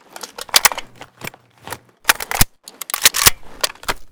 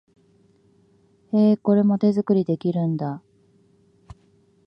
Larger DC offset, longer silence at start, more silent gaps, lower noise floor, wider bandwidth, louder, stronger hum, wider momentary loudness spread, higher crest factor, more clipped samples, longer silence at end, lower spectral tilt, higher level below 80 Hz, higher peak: neither; second, 0.25 s vs 1.35 s; neither; second, -36 dBFS vs -59 dBFS; first, over 20 kHz vs 5.6 kHz; first, -16 LUFS vs -21 LUFS; neither; first, 21 LU vs 10 LU; about the same, 20 dB vs 16 dB; first, 0.4% vs under 0.1%; second, 0.05 s vs 1.5 s; second, 0 dB/octave vs -10.5 dB/octave; first, -34 dBFS vs -64 dBFS; first, 0 dBFS vs -8 dBFS